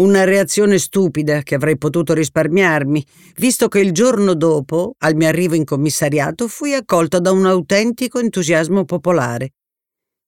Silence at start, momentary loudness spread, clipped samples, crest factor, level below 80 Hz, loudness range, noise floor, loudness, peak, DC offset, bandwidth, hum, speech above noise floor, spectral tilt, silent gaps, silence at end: 0 s; 6 LU; under 0.1%; 14 dB; -54 dBFS; 1 LU; -84 dBFS; -15 LUFS; -2 dBFS; 0.1%; 18 kHz; none; 70 dB; -5 dB/octave; none; 0.8 s